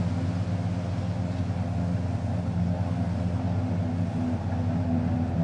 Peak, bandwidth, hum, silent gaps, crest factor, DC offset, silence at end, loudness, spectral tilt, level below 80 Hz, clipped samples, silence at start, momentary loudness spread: -16 dBFS; 9 kHz; none; none; 12 dB; under 0.1%; 0 s; -28 LUFS; -8.5 dB/octave; -50 dBFS; under 0.1%; 0 s; 3 LU